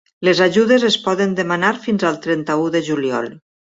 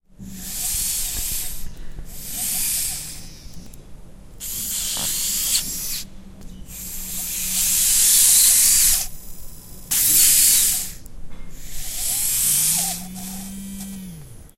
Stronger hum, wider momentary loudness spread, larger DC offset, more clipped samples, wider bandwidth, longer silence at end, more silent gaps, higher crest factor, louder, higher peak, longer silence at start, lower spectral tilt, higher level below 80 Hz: neither; second, 7 LU vs 23 LU; neither; neither; second, 8 kHz vs 16 kHz; first, 0.4 s vs 0.1 s; neither; second, 16 dB vs 22 dB; about the same, -17 LUFS vs -17 LUFS; about the same, -2 dBFS vs 0 dBFS; about the same, 0.2 s vs 0.2 s; first, -5 dB/octave vs 0.5 dB/octave; second, -60 dBFS vs -38 dBFS